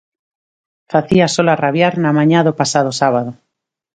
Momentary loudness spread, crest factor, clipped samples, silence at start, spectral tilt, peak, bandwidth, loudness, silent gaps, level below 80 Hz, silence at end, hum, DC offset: 6 LU; 16 dB; under 0.1%; 0.9 s; -5.5 dB/octave; 0 dBFS; 9.4 kHz; -14 LUFS; none; -52 dBFS; 0.6 s; none; under 0.1%